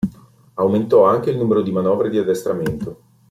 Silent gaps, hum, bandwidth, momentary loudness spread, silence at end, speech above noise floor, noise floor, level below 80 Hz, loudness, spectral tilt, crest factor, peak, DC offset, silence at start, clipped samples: none; none; 15 kHz; 14 LU; 0.35 s; 26 dB; -43 dBFS; -50 dBFS; -18 LUFS; -8 dB/octave; 16 dB; -2 dBFS; under 0.1%; 0 s; under 0.1%